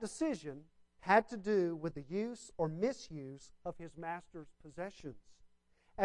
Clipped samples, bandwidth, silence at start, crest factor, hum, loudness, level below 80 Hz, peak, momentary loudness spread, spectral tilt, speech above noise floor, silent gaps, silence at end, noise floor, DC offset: under 0.1%; 11.5 kHz; 0 s; 24 dB; none; -38 LUFS; -66 dBFS; -16 dBFS; 21 LU; -6 dB/octave; 31 dB; none; 0 s; -69 dBFS; under 0.1%